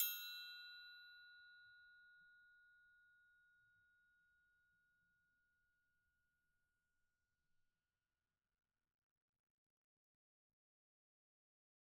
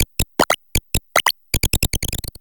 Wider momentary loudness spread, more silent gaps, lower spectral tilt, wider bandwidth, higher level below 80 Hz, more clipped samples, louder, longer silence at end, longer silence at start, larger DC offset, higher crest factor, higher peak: first, 19 LU vs 4 LU; neither; second, 4.5 dB/octave vs -2.5 dB/octave; second, 12 kHz vs 19 kHz; second, under -90 dBFS vs -30 dBFS; neither; second, -51 LUFS vs -20 LUFS; first, 8.2 s vs 0 s; about the same, 0 s vs 0 s; neither; first, 34 dB vs 20 dB; second, -26 dBFS vs 0 dBFS